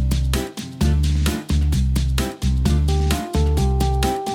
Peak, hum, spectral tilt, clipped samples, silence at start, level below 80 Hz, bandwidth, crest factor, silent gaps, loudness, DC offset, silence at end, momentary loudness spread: -6 dBFS; none; -6 dB/octave; under 0.1%; 0 s; -20 dBFS; 16.5 kHz; 12 dB; none; -21 LUFS; under 0.1%; 0 s; 4 LU